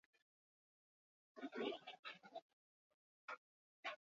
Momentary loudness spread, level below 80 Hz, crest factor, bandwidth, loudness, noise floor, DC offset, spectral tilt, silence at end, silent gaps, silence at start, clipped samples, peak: 12 LU; under -90 dBFS; 22 dB; 7.4 kHz; -53 LUFS; under -90 dBFS; under 0.1%; -0.5 dB/octave; 0.15 s; 1.99-2.03 s, 2.42-3.28 s, 3.37-3.83 s; 1.35 s; under 0.1%; -34 dBFS